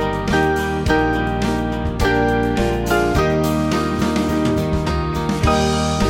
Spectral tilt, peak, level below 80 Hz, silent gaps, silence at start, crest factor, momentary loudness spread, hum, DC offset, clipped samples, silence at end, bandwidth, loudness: -6 dB/octave; -4 dBFS; -28 dBFS; none; 0 s; 14 dB; 4 LU; none; under 0.1%; under 0.1%; 0 s; 17 kHz; -18 LUFS